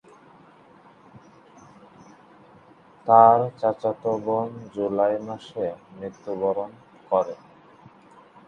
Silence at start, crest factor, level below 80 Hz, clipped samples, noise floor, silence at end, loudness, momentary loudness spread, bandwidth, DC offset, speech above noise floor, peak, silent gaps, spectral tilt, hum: 3.05 s; 24 dB; -68 dBFS; under 0.1%; -52 dBFS; 1.15 s; -23 LUFS; 21 LU; 7 kHz; under 0.1%; 30 dB; 0 dBFS; none; -8 dB/octave; none